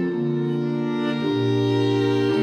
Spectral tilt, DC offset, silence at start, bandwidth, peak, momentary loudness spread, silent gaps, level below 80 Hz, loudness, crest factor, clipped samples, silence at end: -7.5 dB/octave; under 0.1%; 0 s; 9.6 kHz; -10 dBFS; 4 LU; none; -68 dBFS; -22 LUFS; 12 dB; under 0.1%; 0 s